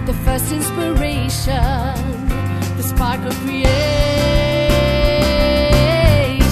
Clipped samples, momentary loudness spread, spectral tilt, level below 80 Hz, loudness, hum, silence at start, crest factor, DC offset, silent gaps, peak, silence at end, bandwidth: under 0.1%; 7 LU; -5.5 dB/octave; -20 dBFS; -16 LUFS; none; 0 s; 14 dB; under 0.1%; none; 0 dBFS; 0 s; 14 kHz